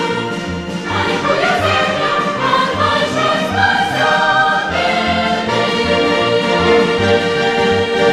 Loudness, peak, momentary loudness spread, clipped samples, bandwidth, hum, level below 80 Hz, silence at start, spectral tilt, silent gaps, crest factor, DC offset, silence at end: -14 LUFS; -2 dBFS; 5 LU; under 0.1%; 13.5 kHz; none; -42 dBFS; 0 s; -4.5 dB/octave; none; 14 dB; under 0.1%; 0 s